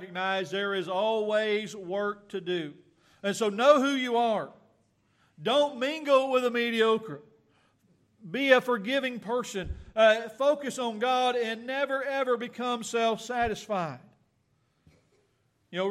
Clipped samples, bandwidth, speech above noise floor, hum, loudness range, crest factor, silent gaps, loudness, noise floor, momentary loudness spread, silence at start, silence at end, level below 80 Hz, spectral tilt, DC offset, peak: under 0.1%; 14 kHz; 44 dB; none; 4 LU; 22 dB; none; -28 LUFS; -71 dBFS; 12 LU; 0 s; 0 s; -58 dBFS; -4 dB/octave; under 0.1%; -6 dBFS